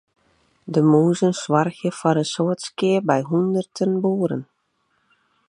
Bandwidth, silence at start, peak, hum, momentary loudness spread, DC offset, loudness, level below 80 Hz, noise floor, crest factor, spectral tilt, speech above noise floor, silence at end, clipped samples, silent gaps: 11 kHz; 0.65 s; -2 dBFS; none; 7 LU; under 0.1%; -21 LUFS; -70 dBFS; -69 dBFS; 20 dB; -6.5 dB/octave; 49 dB; 1.05 s; under 0.1%; none